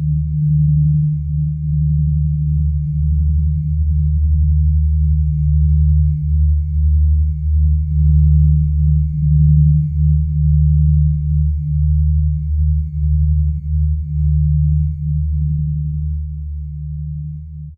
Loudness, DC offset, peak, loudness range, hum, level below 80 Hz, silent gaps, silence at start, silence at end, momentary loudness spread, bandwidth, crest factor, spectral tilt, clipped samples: -16 LUFS; under 0.1%; -4 dBFS; 4 LU; none; -16 dBFS; none; 0 s; 0.05 s; 7 LU; 0.3 kHz; 10 dB; -14.5 dB/octave; under 0.1%